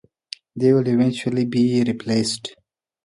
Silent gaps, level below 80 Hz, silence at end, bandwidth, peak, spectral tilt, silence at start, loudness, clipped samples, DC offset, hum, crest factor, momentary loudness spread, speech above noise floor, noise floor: none; -62 dBFS; 0.55 s; 11.5 kHz; -4 dBFS; -6 dB/octave; 0.55 s; -20 LUFS; under 0.1%; under 0.1%; none; 16 dB; 18 LU; 22 dB; -41 dBFS